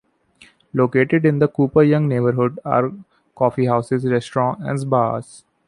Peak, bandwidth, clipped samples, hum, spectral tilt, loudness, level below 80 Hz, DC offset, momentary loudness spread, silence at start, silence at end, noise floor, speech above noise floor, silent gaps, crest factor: -2 dBFS; 11 kHz; under 0.1%; none; -8.5 dB/octave; -19 LUFS; -56 dBFS; under 0.1%; 7 LU; 0.75 s; 0.3 s; -52 dBFS; 34 dB; none; 16 dB